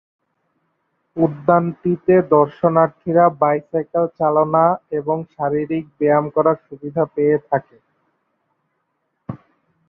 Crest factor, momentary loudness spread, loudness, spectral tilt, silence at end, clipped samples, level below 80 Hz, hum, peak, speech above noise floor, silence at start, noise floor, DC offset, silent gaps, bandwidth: 18 dB; 10 LU; -18 LUFS; -12 dB/octave; 0.5 s; under 0.1%; -60 dBFS; none; -2 dBFS; 54 dB; 1.15 s; -71 dBFS; under 0.1%; none; 3.8 kHz